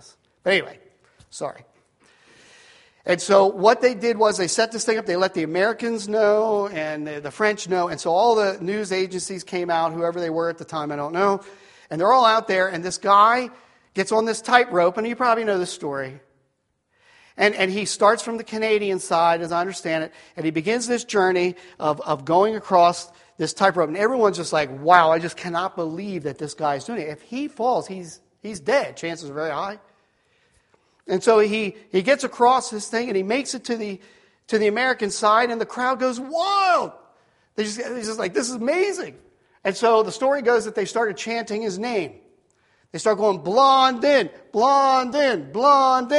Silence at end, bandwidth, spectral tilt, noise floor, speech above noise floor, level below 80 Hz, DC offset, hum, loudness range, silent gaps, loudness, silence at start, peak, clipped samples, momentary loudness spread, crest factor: 0 s; 11.5 kHz; -4 dB/octave; -71 dBFS; 51 dB; -68 dBFS; under 0.1%; none; 5 LU; none; -21 LUFS; 0.45 s; 0 dBFS; under 0.1%; 13 LU; 22 dB